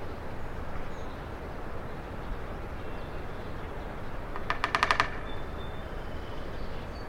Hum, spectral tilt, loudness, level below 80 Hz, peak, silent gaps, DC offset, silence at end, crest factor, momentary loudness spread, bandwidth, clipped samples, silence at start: none; -5 dB/octave; -36 LUFS; -40 dBFS; -4 dBFS; none; under 0.1%; 0 s; 30 dB; 13 LU; 12 kHz; under 0.1%; 0 s